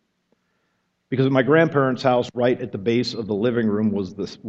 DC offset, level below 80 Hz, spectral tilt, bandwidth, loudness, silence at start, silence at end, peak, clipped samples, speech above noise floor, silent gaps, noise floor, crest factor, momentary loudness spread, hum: under 0.1%; -62 dBFS; -7 dB/octave; 8 kHz; -21 LUFS; 1.1 s; 0 s; -2 dBFS; under 0.1%; 50 dB; none; -71 dBFS; 18 dB; 8 LU; none